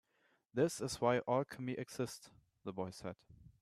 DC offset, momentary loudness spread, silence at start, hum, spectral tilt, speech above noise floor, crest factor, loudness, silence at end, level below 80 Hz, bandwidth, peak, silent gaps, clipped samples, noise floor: under 0.1%; 15 LU; 0.55 s; none; -5.5 dB/octave; 39 dB; 22 dB; -39 LUFS; 0.15 s; -72 dBFS; 13.5 kHz; -20 dBFS; none; under 0.1%; -77 dBFS